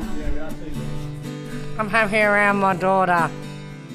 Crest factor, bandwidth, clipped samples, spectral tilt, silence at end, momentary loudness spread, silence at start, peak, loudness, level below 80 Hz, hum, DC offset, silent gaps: 18 dB; 14.5 kHz; under 0.1%; -6 dB/octave; 0 s; 15 LU; 0 s; -4 dBFS; -20 LUFS; -36 dBFS; none; under 0.1%; none